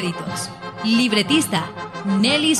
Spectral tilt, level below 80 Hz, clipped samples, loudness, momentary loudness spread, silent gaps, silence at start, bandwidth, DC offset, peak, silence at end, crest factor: -3.5 dB/octave; -58 dBFS; under 0.1%; -20 LUFS; 12 LU; none; 0 s; 14.5 kHz; under 0.1%; -4 dBFS; 0 s; 16 dB